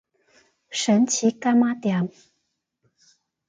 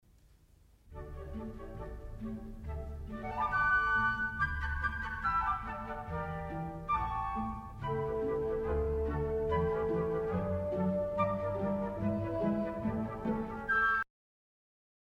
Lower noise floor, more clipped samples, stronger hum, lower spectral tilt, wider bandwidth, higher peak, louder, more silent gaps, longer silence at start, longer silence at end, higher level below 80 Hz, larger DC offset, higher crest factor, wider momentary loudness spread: first, -76 dBFS vs -63 dBFS; neither; neither; second, -4.5 dB/octave vs -8 dB/octave; second, 9.4 kHz vs 14 kHz; first, -8 dBFS vs -18 dBFS; first, -22 LUFS vs -34 LUFS; neither; second, 0.7 s vs 0.85 s; first, 1.4 s vs 1.05 s; second, -72 dBFS vs -46 dBFS; neither; about the same, 16 dB vs 16 dB; second, 9 LU vs 14 LU